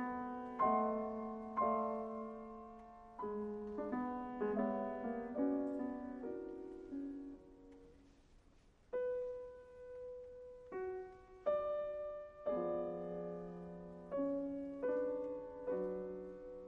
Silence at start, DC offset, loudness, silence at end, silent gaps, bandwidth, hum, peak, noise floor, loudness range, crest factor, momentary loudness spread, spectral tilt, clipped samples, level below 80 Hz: 0 s; under 0.1%; -42 LUFS; 0 s; none; 7 kHz; none; -22 dBFS; -67 dBFS; 7 LU; 20 dB; 15 LU; -9 dB/octave; under 0.1%; -68 dBFS